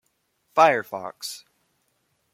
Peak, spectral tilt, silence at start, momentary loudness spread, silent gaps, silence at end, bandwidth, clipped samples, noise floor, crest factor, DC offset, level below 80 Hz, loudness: -4 dBFS; -3 dB/octave; 0.55 s; 16 LU; none; 0.95 s; 16.5 kHz; under 0.1%; -71 dBFS; 22 dB; under 0.1%; -78 dBFS; -23 LUFS